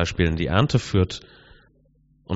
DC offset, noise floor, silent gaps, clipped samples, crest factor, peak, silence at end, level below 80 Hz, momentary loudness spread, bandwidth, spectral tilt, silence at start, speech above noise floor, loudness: under 0.1%; -60 dBFS; none; under 0.1%; 20 dB; -4 dBFS; 0 s; -38 dBFS; 6 LU; 8 kHz; -5.5 dB/octave; 0 s; 38 dB; -22 LUFS